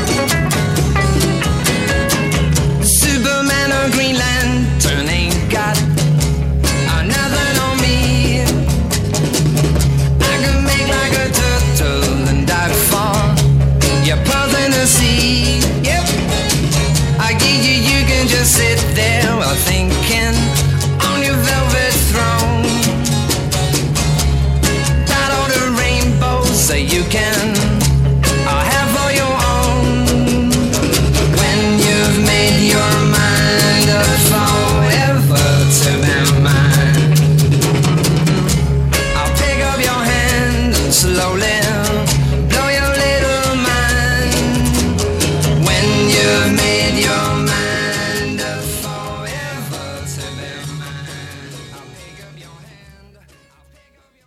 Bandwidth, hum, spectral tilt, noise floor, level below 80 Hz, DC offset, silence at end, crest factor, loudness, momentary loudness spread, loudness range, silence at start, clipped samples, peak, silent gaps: 16.5 kHz; none; -4 dB/octave; -53 dBFS; -22 dBFS; under 0.1%; 1.7 s; 14 dB; -13 LUFS; 5 LU; 3 LU; 0 s; under 0.1%; 0 dBFS; none